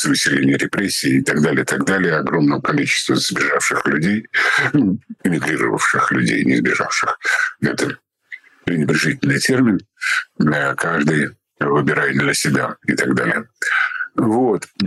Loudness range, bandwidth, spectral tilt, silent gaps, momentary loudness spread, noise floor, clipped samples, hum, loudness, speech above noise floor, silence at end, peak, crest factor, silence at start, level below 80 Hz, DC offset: 2 LU; 12.5 kHz; -4.5 dB/octave; none; 5 LU; -40 dBFS; under 0.1%; none; -17 LUFS; 23 dB; 0 s; -6 dBFS; 12 dB; 0 s; -56 dBFS; under 0.1%